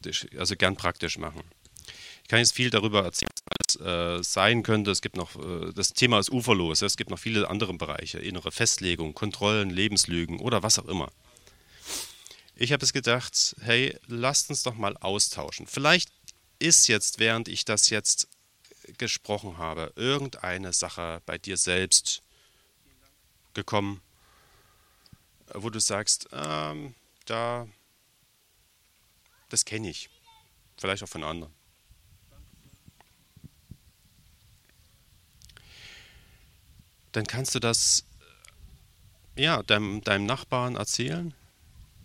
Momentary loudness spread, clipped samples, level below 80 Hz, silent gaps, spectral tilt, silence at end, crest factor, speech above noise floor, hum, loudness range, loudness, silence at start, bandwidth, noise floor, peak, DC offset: 15 LU; under 0.1%; -56 dBFS; none; -2.5 dB/octave; 0.2 s; 26 dB; 38 dB; none; 12 LU; -26 LUFS; 0 s; 16.5 kHz; -65 dBFS; -2 dBFS; under 0.1%